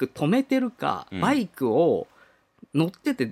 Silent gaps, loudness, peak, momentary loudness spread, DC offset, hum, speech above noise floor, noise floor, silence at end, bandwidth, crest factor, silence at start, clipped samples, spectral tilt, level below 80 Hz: none; -25 LUFS; -8 dBFS; 7 LU; under 0.1%; none; 35 dB; -59 dBFS; 0 s; 15 kHz; 16 dB; 0 s; under 0.1%; -7 dB/octave; -66 dBFS